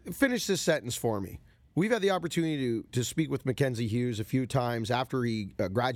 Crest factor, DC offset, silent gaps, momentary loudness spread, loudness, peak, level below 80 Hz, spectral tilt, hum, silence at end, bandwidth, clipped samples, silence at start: 16 dB; under 0.1%; none; 5 LU; -30 LUFS; -12 dBFS; -60 dBFS; -5.5 dB/octave; none; 0 s; 17.5 kHz; under 0.1%; 0.05 s